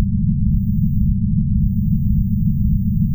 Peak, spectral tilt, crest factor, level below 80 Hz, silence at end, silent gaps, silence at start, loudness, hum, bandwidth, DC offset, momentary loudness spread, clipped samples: -4 dBFS; -18 dB/octave; 12 dB; -22 dBFS; 0 s; none; 0 s; -18 LUFS; none; 16 kHz; under 0.1%; 1 LU; under 0.1%